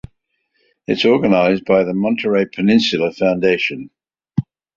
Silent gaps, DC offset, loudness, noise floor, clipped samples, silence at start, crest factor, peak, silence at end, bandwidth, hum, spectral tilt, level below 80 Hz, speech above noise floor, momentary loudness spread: none; under 0.1%; -16 LUFS; -67 dBFS; under 0.1%; 0.9 s; 16 dB; -2 dBFS; 0.35 s; 7.6 kHz; none; -6.5 dB/octave; -52 dBFS; 52 dB; 11 LU